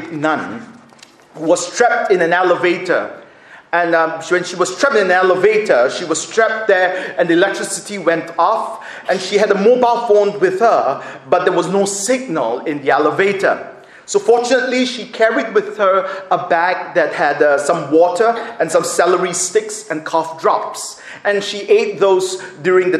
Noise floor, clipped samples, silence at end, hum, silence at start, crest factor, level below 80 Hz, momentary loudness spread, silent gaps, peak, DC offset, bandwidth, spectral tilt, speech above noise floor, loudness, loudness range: -44 dBFS; under 0.1%; 0 s; none; 0 s; 16 dB; -66 dBFS; 8 LU; none; 0 dBFS; under 0.1%; 13.5 kHz; -3.5 dB/octave; 29 dB; -15 LUFS; 2 LU